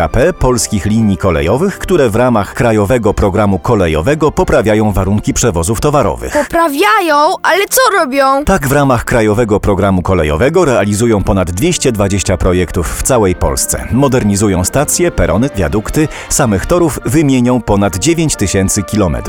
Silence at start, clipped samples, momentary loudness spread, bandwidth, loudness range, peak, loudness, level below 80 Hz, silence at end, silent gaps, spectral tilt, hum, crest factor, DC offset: 0 s; under 0.1%; 3 LU; 18.5 kHz; 2 LU; 0 dBFS; -11 LUFS; -24 dBFS; 0 s; none; -5 dB/octave; none; 10 dB; 0.1%